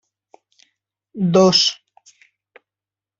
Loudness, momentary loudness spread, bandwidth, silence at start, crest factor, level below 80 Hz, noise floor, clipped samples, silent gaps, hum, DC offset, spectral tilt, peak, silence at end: -15 LUFS; 26 LU; 7.8 kHz; 1.15 s; 20 dB; -62 dBFS; -90 dBFS; under 0.1%; none; none; under 0.1%; -4.5 dB/octave; -2 dBFS; 1.45 s